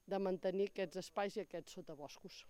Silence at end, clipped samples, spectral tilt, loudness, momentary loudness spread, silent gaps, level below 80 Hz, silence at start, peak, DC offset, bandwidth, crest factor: 0 s; under 0.1%; -5.5 dB/octave; -43 LUFS; 14 LU; none; -76 dBFS; 0.05 s; -28 dBFS; under 0.1%; 15.5 kHz; 16 dB